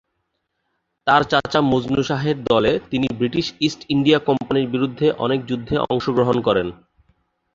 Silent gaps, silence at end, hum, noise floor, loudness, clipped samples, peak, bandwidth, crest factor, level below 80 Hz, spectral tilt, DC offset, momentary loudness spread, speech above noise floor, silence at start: none; 0.8 s; none; -74 dBFS; -19 LUFS; under 0.1%; -2 dBFS; 7.6 kHz; 18 dB; -48 dBFS; -6.5 dB/octave; under 0.1%; 6 LU; 55 dB; 1.05 s